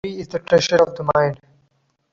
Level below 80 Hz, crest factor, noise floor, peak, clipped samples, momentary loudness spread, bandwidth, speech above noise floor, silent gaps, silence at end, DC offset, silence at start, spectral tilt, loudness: -52 dBFS; 18 dB; -65 dBFS; -4 dBFS; under 0.1%; 12 LU; 7.6 kHz; 47 dB; none; 0.8 s; under 0.1%; 0.05 s; -4.5 dB/octave; -18 LUFS